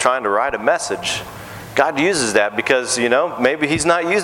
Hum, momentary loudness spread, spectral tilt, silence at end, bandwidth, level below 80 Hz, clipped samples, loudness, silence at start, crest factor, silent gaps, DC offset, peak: none; 7 LU; -3 dB/octave; 0 s; 17.5 kHz; -50 dBFS; under 0.1%; -17 LUFS; 0 s; 18 dB; none; under 0.1%; 0 dBFS